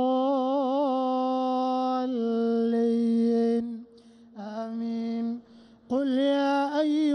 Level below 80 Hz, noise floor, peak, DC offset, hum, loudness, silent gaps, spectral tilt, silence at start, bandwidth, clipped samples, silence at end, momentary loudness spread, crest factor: -74 dBFS; -53 dBFS; -16 dBFS; under 0.1%; none; -26 LUFS; none; -6.5 dB/octave; 0 s; 9.4 kHz; under 0.1%; 0 s; 10 LU; 10 dB